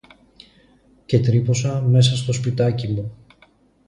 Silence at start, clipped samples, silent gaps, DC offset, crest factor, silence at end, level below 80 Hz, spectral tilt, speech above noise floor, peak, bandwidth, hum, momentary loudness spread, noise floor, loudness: 1.1 s; under 0.1%; none; under 0.1%; 16 dB; 0.7 s; -50 dBFS; -6 dB/octave; 37 dB; -4 dBFS; 10.5 kHz; none; 10 LU; -56 dBFS; -19 LUFS